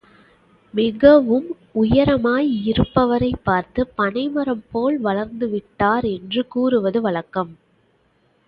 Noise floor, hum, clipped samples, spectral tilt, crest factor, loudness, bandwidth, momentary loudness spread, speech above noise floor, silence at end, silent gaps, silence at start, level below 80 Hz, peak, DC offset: -61 dBFS; none; under 0.1%; -10 dB/octave; 18 dB; -19 LUFS; 5.4 kHz; 10 LU; 43 dB; 0.95 s; none; 0.75 s; -42 dBFS; 0 dBFS; under 0.1%